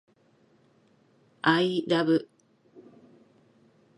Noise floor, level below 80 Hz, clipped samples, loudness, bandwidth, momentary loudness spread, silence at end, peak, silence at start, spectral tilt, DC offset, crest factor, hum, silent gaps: -64 dBFS; -74 dBFS; under 0.1%; -25 LUFS; 11 kHz; 4 LU; 1.75 s; -6 dBFS; 1.45 s; -6.5 dB/octave; under 0.1%; 24 dB; none; none